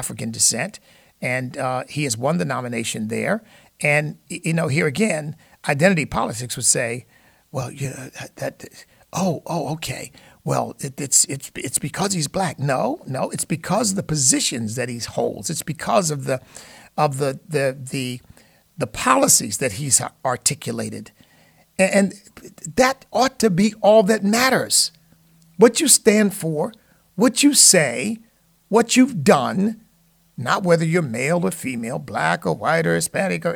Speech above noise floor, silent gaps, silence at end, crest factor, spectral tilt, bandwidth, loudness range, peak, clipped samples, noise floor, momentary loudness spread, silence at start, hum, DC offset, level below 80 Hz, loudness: 39 dB; none; 0 s; 20 dB; -3.5 dB/octave; 19 kHz; 8 LU; -2 dBFS; under 0.1%; -59 dBFS; 15 LU; 0 s; none; under 0.1%; -54 dBFS; -19 LUFS